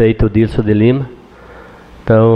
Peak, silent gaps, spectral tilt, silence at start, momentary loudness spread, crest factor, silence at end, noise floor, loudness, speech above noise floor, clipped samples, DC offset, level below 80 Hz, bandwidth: -2 dBFS; none; -10 dB/octave; 0 s; 13 LU; 12 dB; 0 s; -37 dBFS; -13 LUFS; 26 dB; under 0.1%; under 0.1%; -28 dBFS; 5.4 kHz